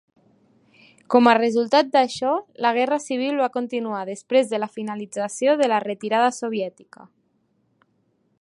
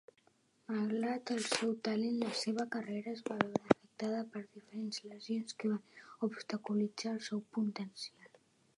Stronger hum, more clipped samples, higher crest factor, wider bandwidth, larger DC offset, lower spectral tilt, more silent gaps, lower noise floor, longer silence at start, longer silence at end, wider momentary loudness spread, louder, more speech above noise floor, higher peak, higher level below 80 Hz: neither; neither; second, 20 dB vs 30 dB; about the same, 11.5 kHz vs 11.5 kHz; neither; about the same, -4 dB/octave vs -4.5 dB/octave; neither; second, -67 dBFS vs -72 dBFS; first, 1.1 s vs 0.7 s; first, 1.7 s vs 0.5 s; about the same, 11 LU vs 11 LU; first, -21 LUFS vs -38 LUFS; first, 46 dB vs 35 dB; first, -2 dBFS vs -10 dBFS; about the same, -76 dBFS vs -78 dBFS